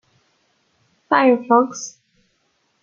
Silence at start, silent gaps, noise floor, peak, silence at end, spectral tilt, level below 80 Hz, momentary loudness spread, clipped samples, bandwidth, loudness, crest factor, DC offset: 1.1 s; none; -66 dBFS; -2 dBFS; 0.95 s; -4 dB/octave; -70 dBFS; 17 LU; under 0.1%; 7.6 kHz; -17 LUFS; 20 dB; under 0.1%